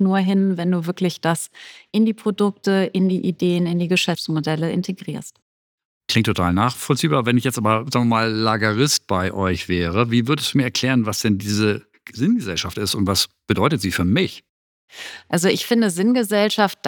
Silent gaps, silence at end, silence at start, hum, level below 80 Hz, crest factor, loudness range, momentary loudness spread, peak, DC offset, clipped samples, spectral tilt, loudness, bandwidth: 5.42-5.78 s, 5.85-6.01 s, 14.49-14.88 s; 0 s; 0 s; none; -50 dBFS; 18 dB; 3 LU; 7 LU; -2 dBFS; under 0.1%; under 0.1%; -5 dB/octave; -20 LUFS; 19 kHz